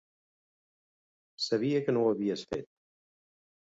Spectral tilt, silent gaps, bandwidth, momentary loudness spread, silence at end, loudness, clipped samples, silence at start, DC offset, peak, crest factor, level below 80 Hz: -6 dB/octave; none; 8 kHz; 10 LU; 1.05 s; -31 LUFS; under 0.1%; 1.4 s; under 0.1%; -16 dBFS; 18 dB; -70 dBFS